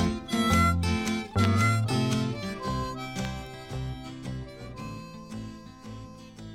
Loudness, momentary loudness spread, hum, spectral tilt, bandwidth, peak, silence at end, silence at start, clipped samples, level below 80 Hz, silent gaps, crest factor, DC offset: -28 LUFS; 20 LU; none; -5.5 dB/octave; 16 kHz; -10 dBFS; 0 s; 0 s; under 0.1%; -44 dBFS; none; 20 dB; under 0.1%